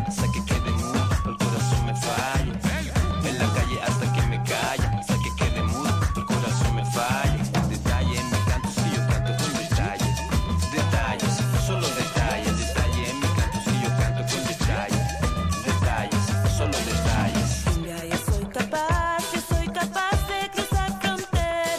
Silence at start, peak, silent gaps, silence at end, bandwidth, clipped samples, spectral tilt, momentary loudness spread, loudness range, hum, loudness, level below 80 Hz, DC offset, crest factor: 0 s; -10 dBFS; none; 0 s; 15.5 kHz; under 0.1%; -5 dB/octave; 3 LU; 1 LU; none; -24 LUFS; -30 dBFS; under 0.1%; 14 dB